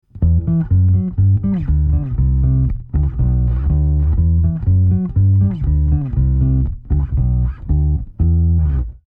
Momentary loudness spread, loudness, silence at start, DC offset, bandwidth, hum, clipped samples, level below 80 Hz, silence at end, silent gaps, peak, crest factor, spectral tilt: 5 LU; -17 LUFS; 0.15 s; under 0.1%; 2.1 kHz; none; under 0.1%; -18 dBFS; 0.15 s; none; -6 dBFS; 8 dB; -13.5 dB/octave